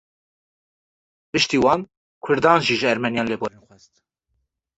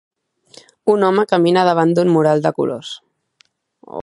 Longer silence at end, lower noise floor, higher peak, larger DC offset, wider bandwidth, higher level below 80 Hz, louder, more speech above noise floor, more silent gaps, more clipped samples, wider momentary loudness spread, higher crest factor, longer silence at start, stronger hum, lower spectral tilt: first, 1.3 s vs 0 s; first, -74 dBFS vs -58 dBFS; about the same, -2 dBFS vs 0 dBFS; neither; second, 8.4 kHz vs 11.5 kHz; first, -56 dBFS vs -66 dBFS; second, -20 LUFS vs -15 LUFS; first, 54 dB vs 44 dB; first, 1.97-2.21 s vs none; neither; second, 13 LU vs 16 LU; first, 22 dB vs 16 dB; first, 1.35 s vs 0.85 s; neither; second, -4.5 dB/octave vs -7 dB/octave